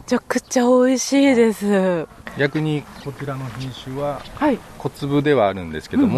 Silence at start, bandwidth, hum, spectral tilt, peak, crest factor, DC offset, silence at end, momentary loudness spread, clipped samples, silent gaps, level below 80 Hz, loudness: 0 s; 13.5 kHz; none; -5.5 dB/octave; -4 dBFS; 14 dB; under 0.1%; 0 s; 14 LU; under 0.1%; none; -48 dBFS; -20 LUFS